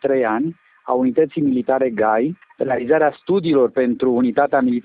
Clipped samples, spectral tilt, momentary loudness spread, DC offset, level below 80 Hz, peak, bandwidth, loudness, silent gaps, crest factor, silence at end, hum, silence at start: under 0.1%; -11.5 dB/octave; 7 LU; under 0.1%; -60 dBFS; -4 dBFS; 4.7 kHz; -18 LUFS; none; 14 dB; 0 s; none; 0.05 s